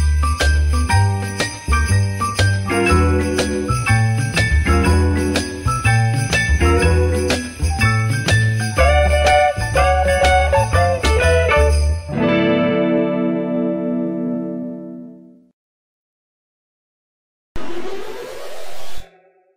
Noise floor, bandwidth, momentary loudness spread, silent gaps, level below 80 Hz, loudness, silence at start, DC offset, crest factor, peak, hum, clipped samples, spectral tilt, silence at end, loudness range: -52 dBFS; 16 kHz; 15 LU; 15.53-17.55 s; -24 dBFS; -16 LUFS; 0 s; under 0.1%; 14 dB; -2 dBFS; none; under 0.1%; -5.5 dB/octave; 0.5 s; 19 LU